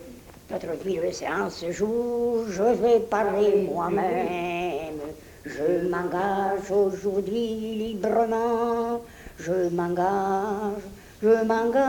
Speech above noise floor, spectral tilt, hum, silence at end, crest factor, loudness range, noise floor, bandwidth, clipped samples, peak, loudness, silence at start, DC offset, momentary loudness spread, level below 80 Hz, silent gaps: 21 dB; -6 dB/octave; none; 0 s; 16 dB; 3 LU; -45 dBFS; 19 kHz; under 0.1%; -10 dBFS; -25 LUFS; 0 s; under 0.1%; 12 LU; -54 dBFS; none